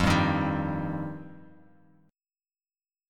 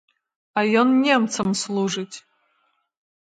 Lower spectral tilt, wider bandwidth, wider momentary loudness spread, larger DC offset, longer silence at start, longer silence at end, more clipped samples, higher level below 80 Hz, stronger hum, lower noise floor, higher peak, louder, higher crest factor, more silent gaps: first, -6 dB/octave vs -4 dB/octave; first, 16 kHz vs 9.4 kHz; first, 19 LU vs 13 LU; neither; second, 0 s vs 0.55 s; first, 1.65 s vs 1.15 s; neither; first, -46 dBFS vs -66 dBFS; neither; first, under -90 dBFS vs -68 dBFS; second, -10 dBFS vs -4 dBFS; second, -28 LUFS vs -21 LUFS; about the same, 20 dB vs 18 dB; neither